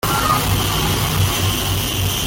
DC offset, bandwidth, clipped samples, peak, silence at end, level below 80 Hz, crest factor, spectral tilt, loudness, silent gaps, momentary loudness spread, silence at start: under 0.1%; 17 kHz; under 0.1%; -6 dBFS; 0 s; -30 dBFS; 12 dB; -3.5 dB/octave; -17 LUFS; none; 2 LU; 0.05 s